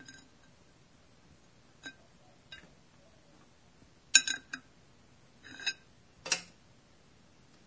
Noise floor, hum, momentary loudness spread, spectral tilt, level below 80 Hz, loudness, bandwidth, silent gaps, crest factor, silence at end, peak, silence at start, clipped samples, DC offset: -63 dBFS; none; 28 LU; 1.5 dB/octave; -72 dBFS; -30 LUFS; 8 kHz; none; 36 dB; 1.2 s; -4 dBFS; 0.1 s; under 0.1%; under 0.1%